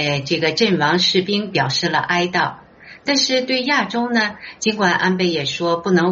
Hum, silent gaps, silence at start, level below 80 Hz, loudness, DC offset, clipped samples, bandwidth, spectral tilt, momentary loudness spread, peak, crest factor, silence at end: none; none; 0 s; -58 dBFS; -18 LUFS; under 0.1%; under 0.1%; 8 kHz; -2.5 dB/octave; 5 LU; -2 dBFS; 16 dB; 0 s